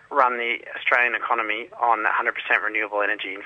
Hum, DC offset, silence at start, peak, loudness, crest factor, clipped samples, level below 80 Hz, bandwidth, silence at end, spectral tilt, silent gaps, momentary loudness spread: none; under 0.1%; 0.1 s; -2 dBFS; -22 LUFS; 20 dB; under 0.1%; -74 dBFS; 8.4 kHz; 0 s; -3.5 dB/octave; none; 6 LU